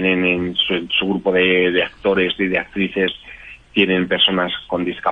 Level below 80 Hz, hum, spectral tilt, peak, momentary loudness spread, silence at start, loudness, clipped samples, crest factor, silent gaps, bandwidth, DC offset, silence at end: -48 dBFS; none; -7 dB/octave; -2 dBFS; 8 LU; 0 s; -17 LUFS; under 0.1%; 16 dB; none; 5.2 kHz; under 0.1%; 0 s